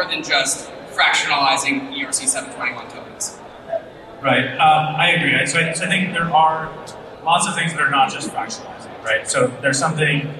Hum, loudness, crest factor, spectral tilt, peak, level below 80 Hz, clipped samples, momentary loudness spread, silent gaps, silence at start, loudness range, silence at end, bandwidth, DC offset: none; -18 LUFS; 16 dB; -2.5 dB/octave; -4 dBFS; -56 dBFS; under 0.1%; 14 LU; none; 0 s; 3 LU; 0 s; 13 kHz; under 0.1%